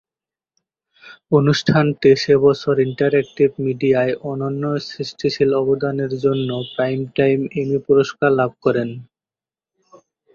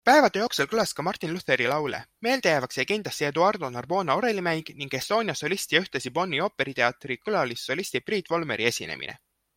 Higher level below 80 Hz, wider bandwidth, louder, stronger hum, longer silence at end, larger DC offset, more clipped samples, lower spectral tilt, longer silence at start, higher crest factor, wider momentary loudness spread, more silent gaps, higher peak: first, -56 dBFS vs -66 dBFS; second, 7.2 kHz vs 16.5 kHz; first, -18 LUFS vs -26 LUFS; neither; first, 1.3 s vs 0.4 s; neither; neither; first, -7 dB/octave vs -3.5 dB/octave; first, 1.05 s vs 0.05 s; about the same, 16 dB vs 20 dB; about the same, 9 LU vs 8 LU; neither; first, -2 dBFS vs -6 dBFS